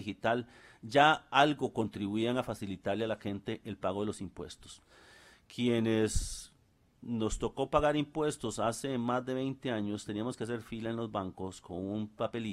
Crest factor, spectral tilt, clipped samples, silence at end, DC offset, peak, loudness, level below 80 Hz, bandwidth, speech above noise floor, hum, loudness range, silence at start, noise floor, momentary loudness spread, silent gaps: 24 dB; -5 dB/octave; under 0.1%; 0 s; under 0.1%; -8 dBFS; -33 LUFS; -50 dBFS; 14.5 kHz; 34 dB; none; 6 LU; 0 s; -68 dBFS; 16 LU; none